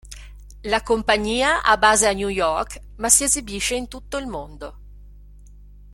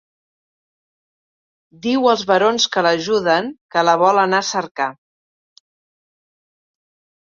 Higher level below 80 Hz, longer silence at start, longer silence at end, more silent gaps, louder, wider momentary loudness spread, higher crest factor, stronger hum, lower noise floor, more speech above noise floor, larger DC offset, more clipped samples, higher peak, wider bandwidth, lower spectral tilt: first, -40 dBFS vs -64 dBFS; second, 0.05 s vs 1.85 s; second, 0 s vs 2.3 s; second, none vs 3.61-3.69 s, 4.71-4.75 s; about the same, -19 LUFS vs -17 LUFS; first, 21 LU vs 9 LU; about the same, 22 dB vs 18 dB; first, 50 Hz at -40 dBFS vs none; second, -44 dBFS vs under -90 dBFS; second, 23 dB vs over 73 dB; neither; neither; about the same, 0 dBFS vs -2 dBFS; first, 16.5 kHz vs 7.6 kHz; second, -1.5 dB/octave vs -3.5 dB/octave